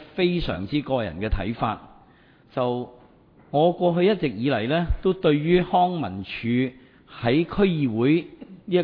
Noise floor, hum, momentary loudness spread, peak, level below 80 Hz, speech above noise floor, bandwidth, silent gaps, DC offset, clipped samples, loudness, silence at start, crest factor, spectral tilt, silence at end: -54 dBFS; none; 10 LU; -8 dBFS; -38 dBFS; 32 dB; 5.2 kHz; none; under 0.1%; under 0.1%; -24 LUFS; 0 s; 16 dB; -10 dB/octave; 0 s